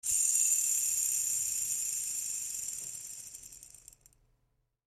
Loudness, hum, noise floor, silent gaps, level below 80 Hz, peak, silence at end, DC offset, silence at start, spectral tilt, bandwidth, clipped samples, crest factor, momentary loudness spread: -29 LUFS; none; -77 dBFS; none; -70 dBFS; -14 dBFS; 1.15 s; under 0.1%; 0.05 s; 3 dB/octave; 16 kHz; under 0.1%; 20 dB; 19 LU